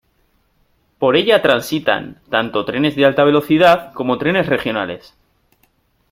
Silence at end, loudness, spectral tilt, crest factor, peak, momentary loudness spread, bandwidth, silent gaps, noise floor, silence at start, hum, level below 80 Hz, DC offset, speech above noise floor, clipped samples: 1.15 s; -15 LUFS; -5.5 dB/octave; 16 dB; 0 dBFS; 9 LU; 16 kHz; none; -61 dBFS; 1 s; none; -52 dBFS; under 0.1%; 45 dB; under 0.1%